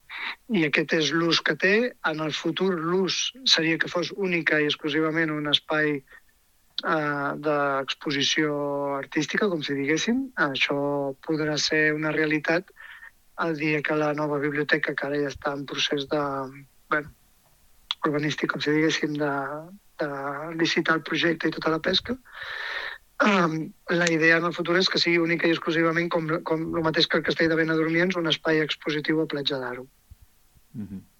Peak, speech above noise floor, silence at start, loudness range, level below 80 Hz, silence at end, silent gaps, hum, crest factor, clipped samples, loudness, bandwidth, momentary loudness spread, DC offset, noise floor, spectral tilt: -2 dBFS; 37 dB; 0.1 s; 5 LU; -62 dBFS; 0.15 s; none; none; 22 dB; under 0.1%; -24 LUFS; 15.5 kHz; 10 LU; under 0.1%; -62 dBFS; -4 dB/octave